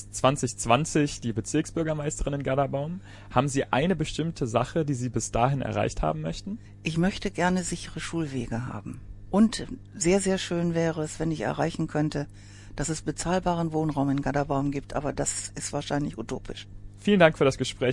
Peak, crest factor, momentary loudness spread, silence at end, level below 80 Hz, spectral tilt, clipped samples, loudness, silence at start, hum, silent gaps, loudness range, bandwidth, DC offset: -4 dBFS; 22 dB; 12 LU; 0 s; -44 dBFS; -5 dB/octave; under 0.1%; -27 LUFS; 0 s; none; none; 2 LU; 11.5 kHz; under 0.1%